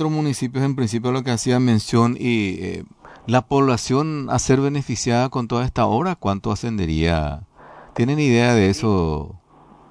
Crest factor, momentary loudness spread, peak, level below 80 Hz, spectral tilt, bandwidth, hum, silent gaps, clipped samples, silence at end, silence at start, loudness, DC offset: 16 dB; 8 LU; -4 dBFS; -40 dBFS; -6 dB/octave; 11 kHz; none; none; under 0.1%; 0.55 s; 0 s; -20 LUFS; under 0.1%